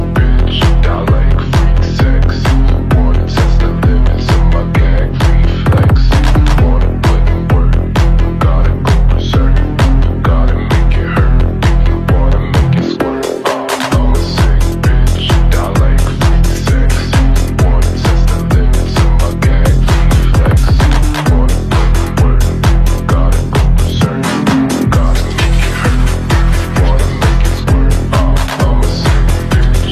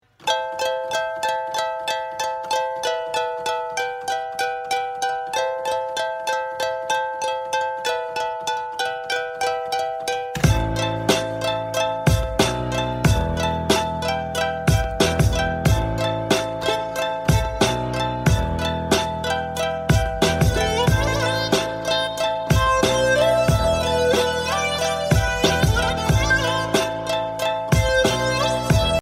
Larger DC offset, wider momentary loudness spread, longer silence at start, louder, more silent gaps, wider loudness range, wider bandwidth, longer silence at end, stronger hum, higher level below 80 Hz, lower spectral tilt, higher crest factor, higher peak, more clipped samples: neither; second, 2 LU vs 7 LU; second, 0 s vs 0.2 s; first, -12 LUFS vs -21 LUFS; neither; second, 1 LU vs 5 LU; second, 13.5 kHz vs 16 kHz; about the same, 0 s vs 0 s; neither; first, -10 dBFS vs -32 dBFS; first, -6.5 dB/octave vs -4.5 dB/octave; second, 8 dB vs 18 dB; first, 0 dBFS vs -4 dBFS; neither